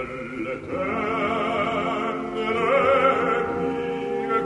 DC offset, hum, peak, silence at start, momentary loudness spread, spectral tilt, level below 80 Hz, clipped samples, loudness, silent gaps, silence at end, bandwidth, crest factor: under 0.1%; none; -6 dBFS; 0 s; 11 LU; -6 dB/octave; -52 dBFS; under 0.1%; -24 LUFS; none; 0 s; 11 kHz; 16 dB